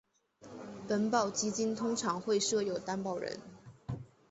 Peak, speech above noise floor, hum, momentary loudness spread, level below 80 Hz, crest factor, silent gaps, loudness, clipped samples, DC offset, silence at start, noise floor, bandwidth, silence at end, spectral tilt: -16 dBFS; 23 dB; none; 17 LU; -66 dBFS; 18 dB; none; -34 LUFS; under 0.1%; under 0.1%; 0.4 s; -56 dBFS; 8.4 kHz; 0.25 s; -4 dB/octave